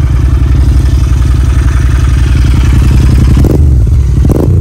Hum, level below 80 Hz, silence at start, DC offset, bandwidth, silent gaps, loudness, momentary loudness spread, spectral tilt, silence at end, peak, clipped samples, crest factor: none; -8 dBFS; 0 s; 0.5%; 12 kHz; none; -8 LUFS; 2 LU; -7.5 dB/octave; 0 s; 0 dBFS; under 0.1%; 6 dB